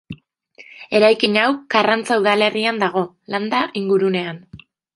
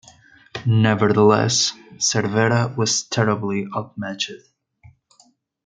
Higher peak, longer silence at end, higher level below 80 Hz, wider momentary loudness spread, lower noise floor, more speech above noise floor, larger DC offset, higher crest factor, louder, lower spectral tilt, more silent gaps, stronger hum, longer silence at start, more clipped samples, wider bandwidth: about the same, 0 dBFS vs -2 dBFS; second, 0.4 s vs 1.3 s; about the same, -62 dBFS vs -62 dBFS; first, 15 LU vs 12 LU; second, -48 dBFS vs -58 dBFS; second, 31 dB vs 39 dB; neither; about the same, 18 dB vs 20 dB; about the same, -18 LUFS vs -19 LUFS; about the same, -5 dB/octave vs -4.5 dB/octave; neither; neither; second, 0.1 s vs 0.55 s; neither; first, 11.5 kHz vs 9.4 kHz